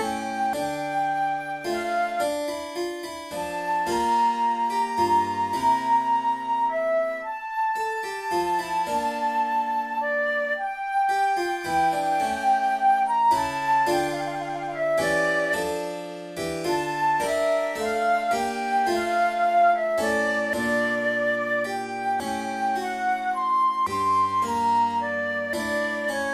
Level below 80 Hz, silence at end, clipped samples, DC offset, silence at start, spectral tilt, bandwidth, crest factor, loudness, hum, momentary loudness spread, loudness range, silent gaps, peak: -58 dBFS; 0 s; under 0.1%; under 0.1%; 0 s; -3.5 dB/octave; 15.5 kHz; 14 dB; -24 LUFS; none; 7 LU; 3 LU; none; -10 dBFS